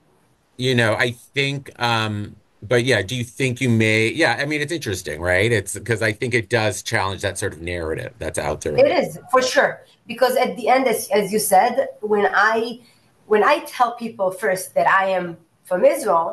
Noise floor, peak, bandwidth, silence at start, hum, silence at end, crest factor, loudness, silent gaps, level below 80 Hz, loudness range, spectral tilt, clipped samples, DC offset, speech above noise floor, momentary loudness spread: -60 dBFS; -4 dBFS; 13 kHz; 0.6 s; none; 0 s; 16 dB; -20 LUFS; none; -50 dBFS; 3 LU; -4.5 dB/octave; under 0.1%; under 0.1%; 40 dB; 10 LU